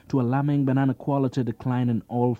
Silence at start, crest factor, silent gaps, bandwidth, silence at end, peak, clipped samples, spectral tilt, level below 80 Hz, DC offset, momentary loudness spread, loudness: 0.1 s; 14 dB; none; 7.6 kHz; 0.05 s; -10 dBFS; under 0.1%; -9.5 dB/octave; -60 dBFS; under 0.1%; 4 LU; -24 LUFS